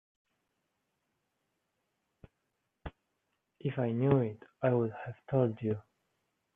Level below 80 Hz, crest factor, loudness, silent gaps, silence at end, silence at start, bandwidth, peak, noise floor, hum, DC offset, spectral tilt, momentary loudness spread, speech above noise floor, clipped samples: -64 dBFS; 24 dB; -33 LUFS; none; 0.75 s; 2.85 s; 3.7 kHz; -12 dBFS; -83 dBFS; none; under 0.1%; -11 dB/octave; 21 LU; 51 dB; under 0.1%